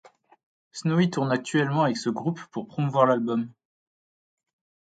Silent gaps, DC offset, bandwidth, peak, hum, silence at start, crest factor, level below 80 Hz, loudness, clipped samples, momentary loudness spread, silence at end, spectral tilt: none; under 0.1%; 9.2 kHz; -4 dBFS; none; 0.75 s; 22 dB; -72 dBFS; -25 LUFS; under 0.1%; 13 LU; 1.35 s; -6.5 dB/octave